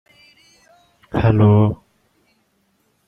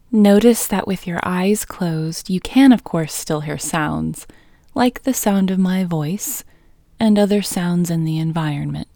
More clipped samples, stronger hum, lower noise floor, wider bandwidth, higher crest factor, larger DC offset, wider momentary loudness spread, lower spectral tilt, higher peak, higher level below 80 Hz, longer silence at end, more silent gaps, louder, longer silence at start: neither; neither; first, -64 dBFS vs -50 dBFS; second, 5 kHz vs over 20 kHz; about the same, 18 dB vs 18 dB; neither; first, 14 LU vs 11 LU; first, -10 dB/octave vs -5.5 dB/octave; about the same, -2 dBFS vs 0 dBFS; about the same, -44 dBFS vs -46 dBFS; first, 1.35 s vs 0.1 s; neither; about the same, -16 LUFS vs -18 LUFS; first, 1.15 s vs 0.1 s